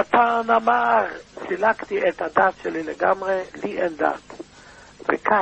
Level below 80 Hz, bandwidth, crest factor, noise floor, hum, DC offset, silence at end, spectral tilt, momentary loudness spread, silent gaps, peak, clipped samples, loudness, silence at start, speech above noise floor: -58 dBFS; 8.6 kHz; 18 dB; -46 dBFS; none; under 0.1%; 0 s; -5 dB/octave; 13 LU; none; -4 dBFS; under 0.1%; -22 LUFS; 0 s; 25 dB